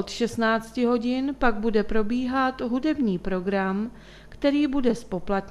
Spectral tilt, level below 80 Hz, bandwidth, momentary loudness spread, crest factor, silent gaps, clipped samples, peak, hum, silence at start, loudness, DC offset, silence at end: -6 dB/octave; -44 dBFS; 12.5 kHz; 5 LU; 20 dB; none; under 0.1%; -6 dBFS; none; 0 s; -25 LUFS; under 0.1%; 0 s